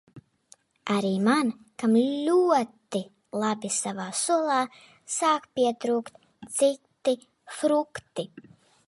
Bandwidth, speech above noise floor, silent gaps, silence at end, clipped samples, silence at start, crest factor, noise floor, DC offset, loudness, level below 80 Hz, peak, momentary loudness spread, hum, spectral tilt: 11.5 kHz; 34 dB; none; 0.45 s; under 0.1%; 0.15 s; 16 dB; -59 dBFS; under 0.1%; -26 LUFS; -74 dBFS; -10 dBFS; 12 LU; none; -4 dB/octave